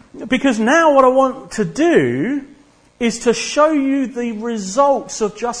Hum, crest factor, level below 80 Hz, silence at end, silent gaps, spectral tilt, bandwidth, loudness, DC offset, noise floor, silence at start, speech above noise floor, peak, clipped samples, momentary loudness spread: none; 16 dB; -50 dBFS; 0 s; none; -4.5 dB/octave; 10.5 kHz; -16 LUFS; under 0.1%; -48 dBFS; 0.15 s; 33 dB; 0 dBFS; under 0.1%; 11 LU